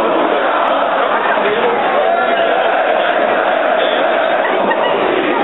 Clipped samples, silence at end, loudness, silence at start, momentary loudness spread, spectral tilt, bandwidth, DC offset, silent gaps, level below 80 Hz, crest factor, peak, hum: under 0.1%; 0 s; -13 LUFS; 0 s; 1 LU; -0.5 dB/octave; 4.1 kHz; 0.4%; none; -60 dBFS; 14 dB; 0 dBFS; none